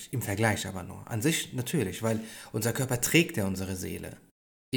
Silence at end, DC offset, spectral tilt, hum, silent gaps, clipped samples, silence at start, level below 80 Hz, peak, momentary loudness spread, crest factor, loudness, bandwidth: 0 s; under 0.1%; -4.5 dB/octave; none; 4.31-4.72 s; under 0.1%; 0 s; -58 dBFS; -10 dBFS; 13 LU; 20 dB; -29 LUFS; over 20 kHz